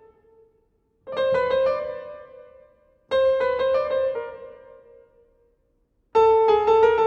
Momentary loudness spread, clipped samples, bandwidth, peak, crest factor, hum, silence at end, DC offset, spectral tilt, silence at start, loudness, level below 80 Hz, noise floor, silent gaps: 20 LU; under 0.1%; 7 kHz; -6 dBFS; 16 dB; none; 0 s; under 0.1%; -5 dB/octave; 1.05 s; -21 LUFS; -54 dBFS; -67 dBFS; none